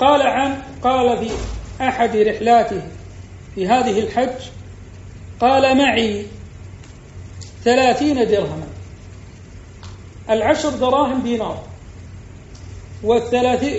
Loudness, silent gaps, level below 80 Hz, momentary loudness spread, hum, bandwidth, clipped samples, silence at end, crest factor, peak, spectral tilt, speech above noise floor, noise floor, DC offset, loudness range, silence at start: -17 LUFS; none; -40 dBFS; 24 LU; none; 8 kHz; under 0.1%; 0 s; 18 dB; -2 dBFS; -3.5 dB/octave; 21 dB; -38 dBFS; under 0.1%; 3 LU; 0 s